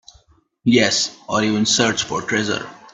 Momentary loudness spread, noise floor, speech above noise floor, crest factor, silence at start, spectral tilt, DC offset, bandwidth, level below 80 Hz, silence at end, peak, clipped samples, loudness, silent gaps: 8 LU; -55 dBFS; 36 dB; 20 dB; 0.65 s; -3 dB/octave; under 0.1%; 8.4 kHz; -56 dBFS; 0.15 s; 0 dBFS; under 0.1%; -18 LUFS; none